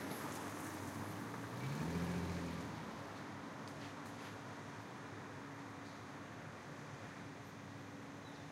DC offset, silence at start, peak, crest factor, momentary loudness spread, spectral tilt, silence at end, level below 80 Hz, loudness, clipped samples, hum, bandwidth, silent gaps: under 0.1%; 0 s; -28 dBFS; 18 dB; 10 LU; -5.5 dB/octave; 0 s; -68 dBFS; -47 LUFS; under 0.1%; none; 16 kHz; none